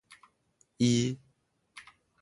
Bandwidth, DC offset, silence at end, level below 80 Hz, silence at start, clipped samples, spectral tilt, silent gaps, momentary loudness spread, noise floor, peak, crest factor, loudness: 11.5 kHz; under 0.1%; 0.4 s; -66 dBFS; 0.8 s; under 0.1%; -5.5 dB/octave; none; 25 LU; -73 dBFS; -14 dBFS; 20 dB; -29 LUFS